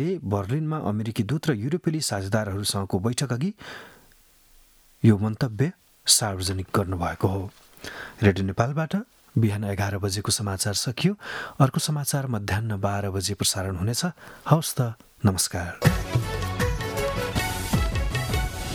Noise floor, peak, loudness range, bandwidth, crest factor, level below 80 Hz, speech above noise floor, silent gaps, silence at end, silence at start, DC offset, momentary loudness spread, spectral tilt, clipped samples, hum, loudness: -56 dBFS; -2 dBFS; 3 LU; 18.5 kHz; 24 dB; -40 dBFS; 31 dB; none; 0 s; 0 s; under 0.1%; 7 LU; -4.5 dB/octave; under 0.1%; none; -25 LUFS